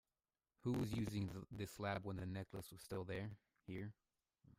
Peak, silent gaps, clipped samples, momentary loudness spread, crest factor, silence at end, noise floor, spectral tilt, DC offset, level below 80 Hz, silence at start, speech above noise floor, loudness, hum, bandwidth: -32 dBFS; none; under 0.1%; 11 LU; 16 dB; 0.1 s; under -90 dBFS; -6.5 dB/octave; under 0.1%; -68 dBFS; 0.65 s; over 44 dB; -47 LUFS; none; 16 kHz